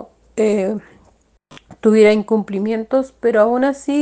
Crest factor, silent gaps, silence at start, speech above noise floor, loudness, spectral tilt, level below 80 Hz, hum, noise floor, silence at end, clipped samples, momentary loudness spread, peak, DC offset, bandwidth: 16 dB; none; 0 s; 39 dB; -16 LUFS; -6.5 dB/octave; -56 dBFS; none; -55 dBFS; 0 s; under 0.1%; 9 LU; -2 dBFS; under 0.1%; 9.2 kHz